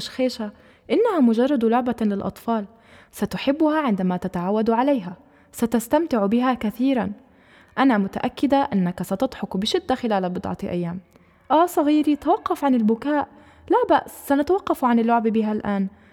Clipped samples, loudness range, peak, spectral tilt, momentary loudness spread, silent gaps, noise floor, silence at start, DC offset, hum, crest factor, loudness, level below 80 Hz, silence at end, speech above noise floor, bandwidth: under 0.1%; 2 LU; -6 dBFS; -6.5 dB/octave; 9 LU; none; -52 dBFS; 0 s; under 0.1%; none; 16 dB; -22 LUFS; -54 dBFS; 0.25 s; 31 dB; 17.5 kHz